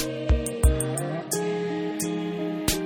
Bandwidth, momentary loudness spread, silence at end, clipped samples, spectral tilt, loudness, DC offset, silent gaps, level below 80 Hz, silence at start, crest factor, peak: 19 kHz; 6 LU; 0 s; under 0.1%; -5 dB/octave; -27 LUFS; under 0.1%; none; -30 dBFS; 0 s; 18 dB; -8 dBFS